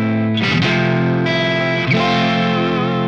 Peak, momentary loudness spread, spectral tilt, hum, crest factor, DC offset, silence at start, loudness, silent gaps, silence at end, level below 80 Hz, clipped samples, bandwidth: -4 dBFS; 2 LU; -6.5 dB/octave; none; 12 dB; 0.4%; 0 s; -16 LUFS; none; 0 s; -52 dBFS; under 0.1%; 8 kHz